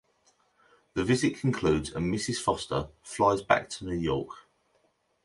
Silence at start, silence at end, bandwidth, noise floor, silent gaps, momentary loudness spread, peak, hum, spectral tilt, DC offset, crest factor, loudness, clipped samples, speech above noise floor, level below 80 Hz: 0.95 s; 0.85 s; 11.5 kHz; -71 dBFS; none; 9 LU; -8 dBFS; none; -5 dB/octave; under 0.1%; 22 dB; -29 LUFS; under 0.1%; 43 dB; -50 dBFS